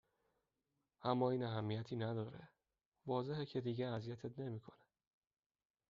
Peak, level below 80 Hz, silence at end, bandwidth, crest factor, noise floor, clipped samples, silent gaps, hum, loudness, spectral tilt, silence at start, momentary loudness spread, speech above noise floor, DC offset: -22 dBFS; -78 dBFS; 1.15 s; 7.2 kHz; 22 dB; under -90 dBFS; under 0.1%; 2.86-2.92 s; none; -43 LUFS; -6.5 dB/octave; 1 s; 12 LU; over 48 dB; under 0.1%